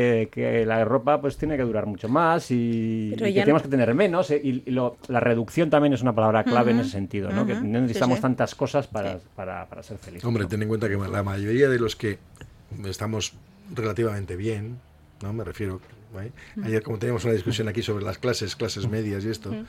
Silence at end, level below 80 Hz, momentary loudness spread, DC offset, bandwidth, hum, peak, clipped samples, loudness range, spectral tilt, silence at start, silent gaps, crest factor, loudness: 0 s; -52 dBFS; 14 LU; under 0.1%; 15.5 kHz; none; -4 dBFS; under 0.1%; 8 LU; -6.5 dB/octave; 0 s; none; 20 dB; -25 LUFS